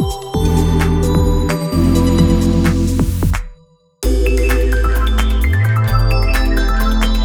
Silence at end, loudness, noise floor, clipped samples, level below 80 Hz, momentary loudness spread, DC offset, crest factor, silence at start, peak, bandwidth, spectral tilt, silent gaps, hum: 0 s; -15 LUFS; -47 dBFS; under 0.1%; -16 dBFS; 5 LU; under 0.1%; 12 dB; 0 s; 0 dBFS; 18.5 kHz; -6.5 dB/octave; none; none